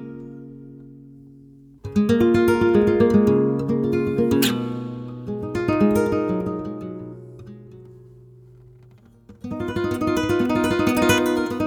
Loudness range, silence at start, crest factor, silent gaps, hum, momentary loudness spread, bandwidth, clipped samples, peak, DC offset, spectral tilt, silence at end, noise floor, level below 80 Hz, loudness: 13 LU; 0 s; 18 dB; none; none; 22 LU; over 20 kHz; under 0.1%; -4 dBFS; under 0.1%; -6 dB/octave; 0 s; -50 dBFS; -46 dBFS; -20 LUFS